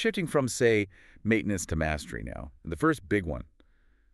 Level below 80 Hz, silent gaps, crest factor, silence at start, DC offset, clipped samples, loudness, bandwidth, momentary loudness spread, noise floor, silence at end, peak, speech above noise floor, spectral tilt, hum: -46 dBFS; none; 18 dB; 0 s; under 0.1%; under 0.1%; -29 LUFS; 13.5 kHz; 14 LU; -62 dBFS; 0.7 s; -10 dBFS; 34 dB; -5 dB/octave; none